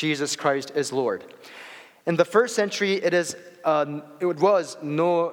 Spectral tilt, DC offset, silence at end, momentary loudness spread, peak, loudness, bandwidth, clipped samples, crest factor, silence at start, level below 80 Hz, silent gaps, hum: -4.5 dB/octave; under 0.1%; 0 s; 14 LU; -4 dBFS; -24 LUFS; 17.5 kHz; under 0.1%; 20 dB; 0 s; -82 dBFS; none; none